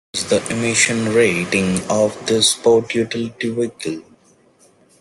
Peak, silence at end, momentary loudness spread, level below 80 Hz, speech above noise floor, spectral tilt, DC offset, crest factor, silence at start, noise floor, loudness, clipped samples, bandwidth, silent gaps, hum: 0 dBFS; 1 s; 8 LU; -56 dBFS; 36 dB; -3.5 dB/octave; under 0.1%; 18 dB; 0.15 s; -53 dBFS; -17 LUFS; under 0.1%; 12.5 kHz; none; none